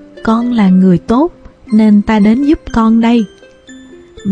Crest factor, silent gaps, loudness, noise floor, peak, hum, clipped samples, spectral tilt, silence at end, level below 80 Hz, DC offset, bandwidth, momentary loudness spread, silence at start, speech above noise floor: 10 dB; none; -10 LUFS; -36 dBFS; 0 dBFS; none; under 0.1%; -8.5 dB/octave; 0 s; -34 dBFS; under 0.1%; 8.8 kHz; 6 LU; 0.25 s; 27 dB